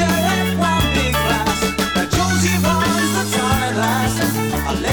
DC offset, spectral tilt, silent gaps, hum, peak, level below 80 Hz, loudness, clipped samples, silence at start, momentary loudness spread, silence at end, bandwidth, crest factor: 0.5%; -4 dB/octave; none; none; -2 dBFS; -32 dBFS; -17 LUFS; under 0.1%; 0 s; 3 LU; 0 s; 19.5 kHz; 14 dB